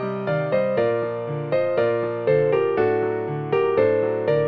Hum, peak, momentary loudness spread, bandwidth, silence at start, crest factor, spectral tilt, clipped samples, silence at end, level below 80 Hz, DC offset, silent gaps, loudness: none; -6 dBFS; 6 LU; 5.2 kHz; 0 s; 14 dB; -9.5 dB/octave; under 0.1%; 0 s; -60 dBFS; under 0.1%; none; -22 LUFS